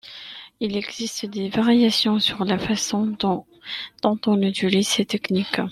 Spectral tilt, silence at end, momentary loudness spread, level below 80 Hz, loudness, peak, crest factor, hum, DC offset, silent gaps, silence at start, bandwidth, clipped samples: -4.5 dB/octave; 0 s; 13 LU; -58 dBFS; -22 LUFS; -2 dBFS; 20 dB; none; under 0.1%; none; 0.05 s; 14 kHz; under 0.1%